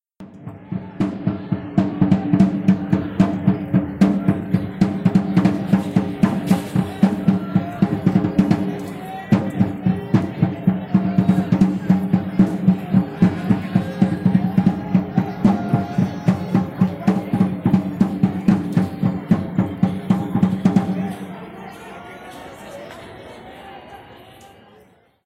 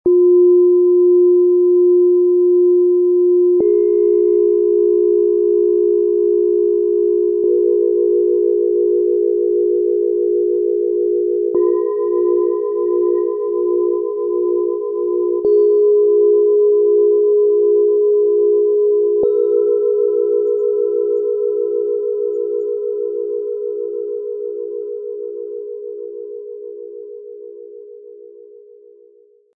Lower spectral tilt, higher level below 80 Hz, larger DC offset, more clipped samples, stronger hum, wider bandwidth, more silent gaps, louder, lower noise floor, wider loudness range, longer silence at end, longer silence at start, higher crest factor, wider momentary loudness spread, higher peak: second, -9 dB/octave vs -12 dB/octave; first, -48 dBFS vs -68 dBFS; neither; neither; neither; first, 10 kHz vs 1.4 kHz; neither; second, -19 LUFS vs -15 LUFS; about the same, -52 dBFS vs -50 dBFS; second, 5 LU vs 13 LU; second, 0.8 s vs 1.25 s; first, 0.2 s vs 0.05 s; first, 16 dB vs 8 dB; first, 18 LU vs 14 LU; first, -2 dBFS vs -6 dBFS